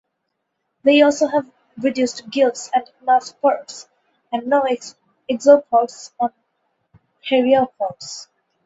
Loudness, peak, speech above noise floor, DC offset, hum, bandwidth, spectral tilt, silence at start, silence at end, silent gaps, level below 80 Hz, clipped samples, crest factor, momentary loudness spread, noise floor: -18 LUFS; 0 dBFS; 57 dB; under 0.1%; none; 8 kHz; -3.5 dB/octave; 0.85 s; 0.4 s; none; -66 dBFS; under 0.1%; 20 dB; 19 LU; -75 dBFS